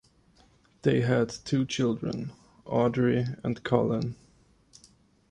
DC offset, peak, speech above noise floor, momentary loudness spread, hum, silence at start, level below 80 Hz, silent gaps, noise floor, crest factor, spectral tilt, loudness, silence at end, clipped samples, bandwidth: under 0.1%; -8 dBFS; 35 dB; 11 LU; none; 0.85 s; -58 dBFS; none; -62 dBFS; 22 dB; -6.5 dB/octave; -28 LUFS; 1.15 s; under 0.1%; 10 kHz